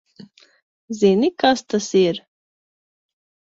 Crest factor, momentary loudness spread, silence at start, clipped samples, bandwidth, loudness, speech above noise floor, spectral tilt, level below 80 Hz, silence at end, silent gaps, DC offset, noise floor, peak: 22 dB; 10 LU; 0.2 s; under 0.1%; 7.8 kHz; -18 LUFS; 29 dB; -5 dB/octave; -64 dBFS; 1.4 s; 0.62-0.88 s; under 0.1%; -46 dBFS; 0 dBFS